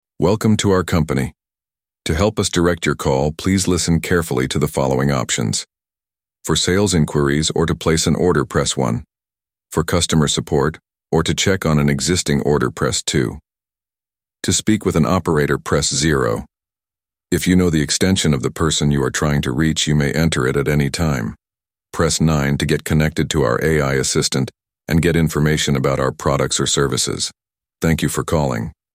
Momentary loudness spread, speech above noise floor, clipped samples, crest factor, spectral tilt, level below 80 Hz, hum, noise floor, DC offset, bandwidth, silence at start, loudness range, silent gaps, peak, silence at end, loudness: 6 LU; over 73 dB; under 0.1%; 16 dB; -4.5 dB/octave; -36 dBFS; none; under -90 dBFS; under 0.1%; 16 kHz; 0.2 s; 2 LU; none; -2 dBFS; 0.25 s; -18 LUFS